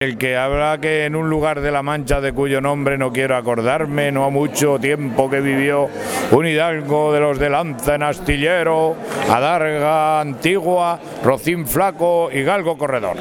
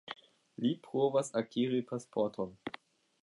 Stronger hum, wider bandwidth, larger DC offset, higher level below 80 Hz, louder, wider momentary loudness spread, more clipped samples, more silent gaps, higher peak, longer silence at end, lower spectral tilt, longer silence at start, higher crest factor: neither; first, 19 kHz vs 11.5 kHz; neither; first, -36 dBFS vs -78 dBFS; first, -17 LUFS vs -34 LUFS; second, 4 LU vs 17 LU; neither; neither; first, 0 dBFS vs -18 dBFS; second, 0 s vs 0.45 s; about the same, -5 dB/octave vs -6 dB/octave; about the same, 0 s vs 0.1 s; about the same, 18 dB vs 18 dB